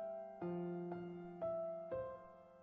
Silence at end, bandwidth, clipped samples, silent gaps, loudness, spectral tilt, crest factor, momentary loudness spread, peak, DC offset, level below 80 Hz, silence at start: 0 s; 4.5 kHz; under 0.1%; none; -46 LUFS; -9 dB/octave; 12 dB; 7 LU; -34 dBFS; under 0.1%; -76 dBFS; 0 s